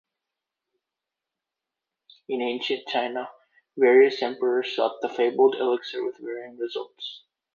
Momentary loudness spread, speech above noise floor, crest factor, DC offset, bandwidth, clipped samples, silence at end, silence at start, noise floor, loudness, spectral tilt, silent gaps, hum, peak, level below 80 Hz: 17 LU; 63 dB; 18 dB; under 0.1%; 7 kHz; under 0.1%; 0.4 s; 2.3 s; -87 dBFS; -24 LUFS; -4.5 dB/octave; none; none; -8 dBFS; -82 dBFS